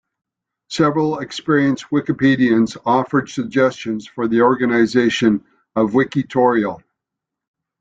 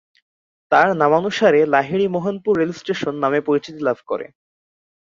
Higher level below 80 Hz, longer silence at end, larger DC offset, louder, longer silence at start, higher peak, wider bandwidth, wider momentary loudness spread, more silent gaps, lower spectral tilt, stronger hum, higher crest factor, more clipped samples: first, -56 dBFS vs -62 dBFS; first, 1 s vs 0.8 s; neither; about the same, -17 LUFS vs -18 LUFS; about the same, 0.7 s vs 0.7 s; about the same, -2 dBFS vs -2 dBFS; first, 8.8 kHz vs 7.6 kHz; about the same, 9 LU vs 9 LU; neither; about the same, -6 dB/octave vs -6 dB/octave; neither; about the same, 16 dB vs 18 dB; neither